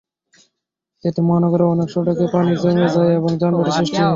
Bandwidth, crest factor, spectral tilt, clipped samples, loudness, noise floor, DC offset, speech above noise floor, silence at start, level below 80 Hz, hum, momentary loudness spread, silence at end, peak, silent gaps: 7.6 kHz; 14 dB; -7.5 dB/octave; under 0.1%; -17 LUFS; -78 dBFS; under 0.1%; 62 dB; 1.05 s; -54 dBFS; none; 4 LU; 0 s; -4 dBFS; none